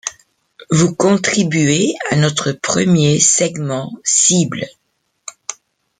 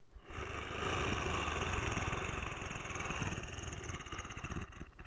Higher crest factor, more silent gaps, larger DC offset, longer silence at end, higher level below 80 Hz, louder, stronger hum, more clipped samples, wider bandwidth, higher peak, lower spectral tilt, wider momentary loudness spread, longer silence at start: about the same, 16 dB vs 18 dB; neither; neither; first, 0.45 s vs 0 s; about the same, -52 dBFS vs -50 dBFS; first, -14 LUFS vs -40 LUFS; neither; neither; about the same, 9.6 kHz vs 10 kHz; first, 0 dBFS vs -24 dBFS; about the same, -4 dB/octave vs -4 dB/octave; first, 18 LU vs 9 LU; about the same, 0.05 s vs 0 s